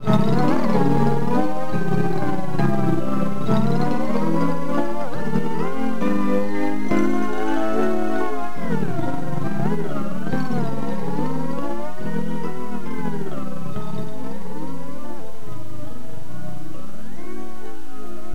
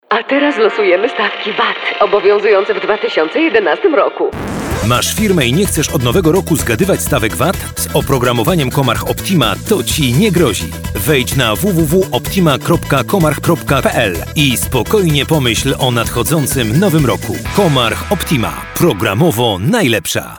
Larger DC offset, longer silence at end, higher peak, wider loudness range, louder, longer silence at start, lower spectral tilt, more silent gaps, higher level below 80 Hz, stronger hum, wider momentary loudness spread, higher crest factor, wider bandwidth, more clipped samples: first, 20% vs under 0.1%; about the same, 0 s vs 0 s; second, -6 dBFS vs 0 dBFS; first, 12 LU vs 1 LU; second, -24 LUFS vs -13 LUFS; about the same, 0 s vs 0.1 s; first, -7.5 dB/octave vs -4.5 dB/octave; neither; second, -46 dBFS vs -30 dBFS; neither; first, 17 LU vs 4 LU; first, 20 dB vs 12 dB; second, 16 kHz vs over 20 kHz; neither